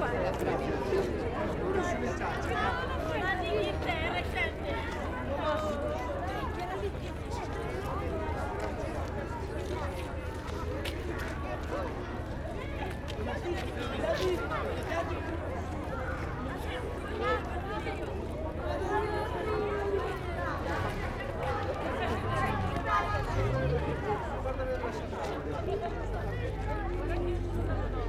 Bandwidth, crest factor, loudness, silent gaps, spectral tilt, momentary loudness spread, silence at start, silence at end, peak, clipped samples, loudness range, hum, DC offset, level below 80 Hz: 14.5 kHz; 18 dB; -34 LUFS; none; -6.5 dB/octave; 6 LU; 0 s; 0 s; -14 dBFS; under 0.1%; 4 LU; none; under 0.1%; -40 dBFS